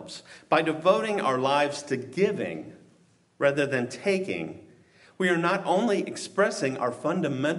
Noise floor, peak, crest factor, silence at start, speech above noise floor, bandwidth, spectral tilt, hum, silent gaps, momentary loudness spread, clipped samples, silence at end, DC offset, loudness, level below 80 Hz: -62 dBFS; -8 dBFS; 20 dB; 0 s; 35 dB; 11.5 kHz; -5 dB/octave; none; none; 10 LU; under 0.1%; 0 s; under 0.1%; -26 LUFS; -74 dBFS